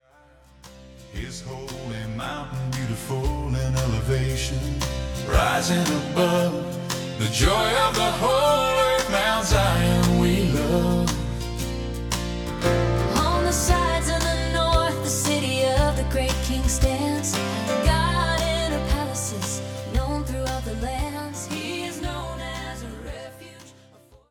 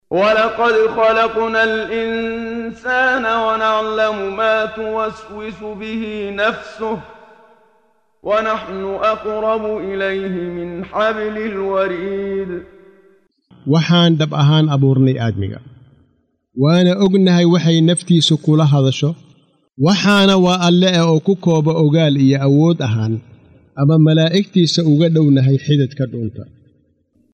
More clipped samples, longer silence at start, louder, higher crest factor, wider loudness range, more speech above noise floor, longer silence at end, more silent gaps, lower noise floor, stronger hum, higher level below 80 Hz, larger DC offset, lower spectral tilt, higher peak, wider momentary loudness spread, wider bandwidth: neither; first, 0.65 s vs 0.1 s; second, -23 LUFS vs -15 LUFS; first, 18 dB vs 12 dB; about the same, 9 LU vs 8 LU; second, 31 dB vs 47 dB; second, 0.6 s vs 0.9 s; neither; second, -54 dBFS vs -62 dBFS; neither; first, -30 dBFS vs -52 dBFS; neither; second, -4.5 dB/octave vs -6.5 dB/octave; second, -6 dBFS vs -2 dBFS; about the same, 12 LU vs 12 LU; first, 18 kHz vs 9.4 kHz